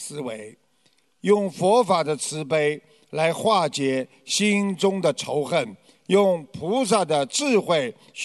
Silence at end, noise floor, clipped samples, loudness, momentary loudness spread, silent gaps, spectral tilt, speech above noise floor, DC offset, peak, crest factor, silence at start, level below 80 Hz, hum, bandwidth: 0 s; -65 dBFS; under 0.1%; -22 LUFS; 12 LU; none; -4 dB/octave; 43 dB; under 0.1%; -4 dBFS; 18 dB; 0 s; -70 dBFS; none; 12 kHz